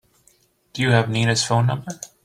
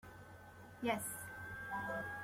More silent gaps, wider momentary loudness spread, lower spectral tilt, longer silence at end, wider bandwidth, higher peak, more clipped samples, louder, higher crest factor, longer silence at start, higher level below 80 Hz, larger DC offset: neither; second, 14 LU vs 17 LU; about the same, -4.5 dB/octave vs -4 dB/octave; first, 0.2 s vs 0 s; second, 12 kHz vs 16.5 kHz; first, -2 dBFS vs -22 dBFS; neither; first, -20 LUFS vs -43 LUFS; about the same, 20 dB vs 22 dB; first, 0.75 s vs 0.05 s; first, -54 dBFS vs -68 dBFS; neither